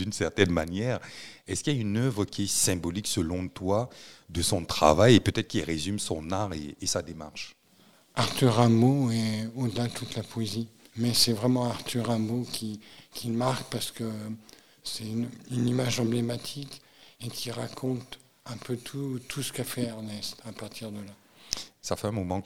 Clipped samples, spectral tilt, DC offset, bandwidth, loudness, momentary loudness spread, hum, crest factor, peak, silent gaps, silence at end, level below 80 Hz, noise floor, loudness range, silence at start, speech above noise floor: under 0.1%; -4.5 dB/octave; 0.2%; 16.5 kHz; -28 LUFS; 17 LU; none; 26 dB; -4 dBFS; none; 0 s; -52 dBFS; -60 dBFS; 9 LU; 0 s; 32 dB